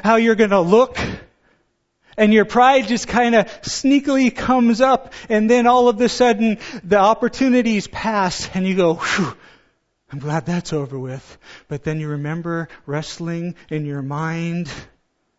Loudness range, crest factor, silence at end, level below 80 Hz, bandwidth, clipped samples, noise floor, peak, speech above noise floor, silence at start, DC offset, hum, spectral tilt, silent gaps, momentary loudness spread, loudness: 10 LU; 18 dB; 0.55 s; -48 dBFS; 8 kHz; under 0.1%; -66 dBFS; 0 dBFS; 49 dB; 0 s; under 0.1%; none; -5.5 dB/octave; none; 14 LU; -18 LUFS